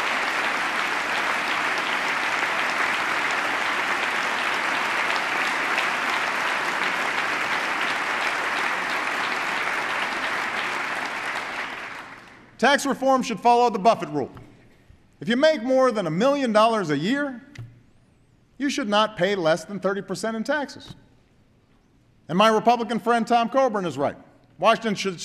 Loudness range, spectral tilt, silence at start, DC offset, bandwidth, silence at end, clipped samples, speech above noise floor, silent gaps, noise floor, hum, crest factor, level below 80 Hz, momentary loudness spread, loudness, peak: 3 LU; -3.5 dB/octave; 0 s; under 0.1%; 14 kHz; 0 s; under 0.1%; 37 dB; none; -59 dBFS; none; 18 dB; -64 dBFS; 8 LU; -23 LUFS; -6 dBFS